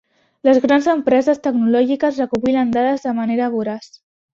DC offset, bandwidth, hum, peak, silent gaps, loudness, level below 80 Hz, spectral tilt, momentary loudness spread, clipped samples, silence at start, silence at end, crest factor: under 0.1%; 7.4 kHz; none; -2 dBFS; none; -17 LUFS; -58 dBFS; -6 dB/octave; 6 LU; under 0.1%; 0.45 s; 0.5 s; 16 dB